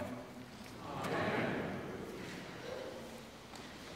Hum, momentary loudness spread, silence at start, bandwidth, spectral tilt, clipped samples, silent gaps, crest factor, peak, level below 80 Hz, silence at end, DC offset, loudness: none; 14 LU; 0 s; 16 kHz; -5 dB/octave; under 0.1%; none; 18 dB; -24 dBFS; -66 dBFS; 0 s; under 0.1%; -42 LUFS